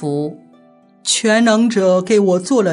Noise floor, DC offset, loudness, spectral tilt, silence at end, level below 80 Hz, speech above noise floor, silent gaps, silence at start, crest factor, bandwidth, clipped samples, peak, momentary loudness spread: -49 dBFS; under 0.1%; -14 LUFS; -4 dB/octave; 0 s; -70 dBFS; 35 dB; none; 0 s; 12 dB; 11 kHz; under 0.1%; -2 dBFS; 11 LU